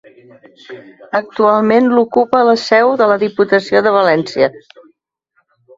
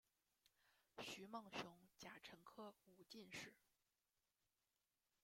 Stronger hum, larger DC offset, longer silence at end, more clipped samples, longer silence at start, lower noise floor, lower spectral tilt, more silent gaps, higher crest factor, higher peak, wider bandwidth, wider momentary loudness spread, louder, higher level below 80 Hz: neither; neither; second, 1.2 s vs 1.65 s; neither; first, 0.7 s vs 0.45 s; second, -63 dBFS vs under -90 dBFS; first, -5.5 dB/octave vs -3 dB/octave; neither; second, 14 dB vs 24 dB; first, 0 dBFS vs -36 dBFS; second, 7.6 kHz vs 16.5 kHz; second, 6 LU vs 9 LU; first, -12 LUFS vs -58 LUFS; first, -58 dBFS vs under -90 dBFS